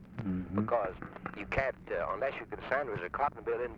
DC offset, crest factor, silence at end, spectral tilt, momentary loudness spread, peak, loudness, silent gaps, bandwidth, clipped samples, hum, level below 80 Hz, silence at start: under 0.1%; 18 dB; 0 s; -8 dB/octave; 8 LU; -16 dBFS; -35 LUFS; none; 7.6 kHz; under 0.1%; none; -54 dBFS; 0 s